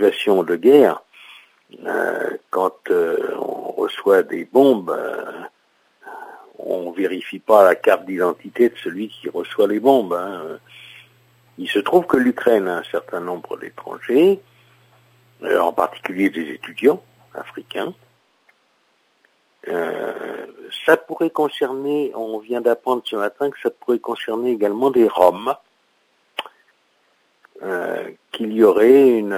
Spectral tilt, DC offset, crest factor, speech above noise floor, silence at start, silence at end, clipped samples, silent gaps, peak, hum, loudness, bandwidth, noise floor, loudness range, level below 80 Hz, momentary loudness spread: -5.5 dB/octave; under 0.1%; 20 dB; 44 dB; 0 s; 0 s; under 0.1%; none; 0 dBFS; none; -19 LUFS; 16 kHz; -63 dBFS; 6 LU; -70 dBFS; 18 LU